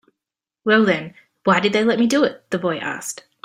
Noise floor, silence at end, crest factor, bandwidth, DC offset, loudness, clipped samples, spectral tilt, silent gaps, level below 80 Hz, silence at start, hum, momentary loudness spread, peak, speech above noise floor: -86 dBFS; 0.3 s; 18 dB; 15.5 kHz; under 0.1%; -19 LUFS; under 0.1%; -4.5 dB/octave; none; -62 dBFS; 0.65 s; none; 12 LU; -2 dBFS; 68 dB